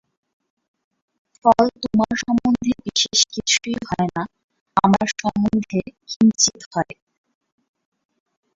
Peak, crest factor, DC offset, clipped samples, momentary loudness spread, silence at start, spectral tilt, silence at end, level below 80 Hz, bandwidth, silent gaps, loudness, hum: -2 dBFS; 20 dB; under 0.1%; under 0.1%; 10 LU; 1.45 s; -3.5 dB/octave; 1.75 s; -52 dBFS; 7.8 kHz; 4.43-4.49 s, 4.61-4.66 s, 6.16-6.20 s, 6.66-6.71 s; -19 LUFS; none